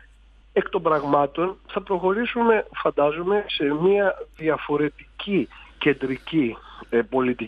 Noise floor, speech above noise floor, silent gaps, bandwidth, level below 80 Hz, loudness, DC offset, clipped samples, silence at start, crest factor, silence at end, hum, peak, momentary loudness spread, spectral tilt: -52 dBFS; 29 dB; none; 5.2 kHz; -52 dBFS; -23 LUFS; under 0.1%; under 0.1%; 0.55 s; 18 dB; 0 s; none; -6 dBFS; 7 LU; -8 dB/octave